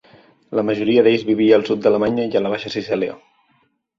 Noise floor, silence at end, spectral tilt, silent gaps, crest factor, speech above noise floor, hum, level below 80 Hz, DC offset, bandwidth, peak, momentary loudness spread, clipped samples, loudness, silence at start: -63 dBFS; 0.8 s; -7 dB/octave; none; 18 dB; 46 dB; none; -58 dBFS; under 0.1%; 7.4 kHz; -2 dBFS; 9 LU; under 0.1%; -18 LUFS; 0.5 s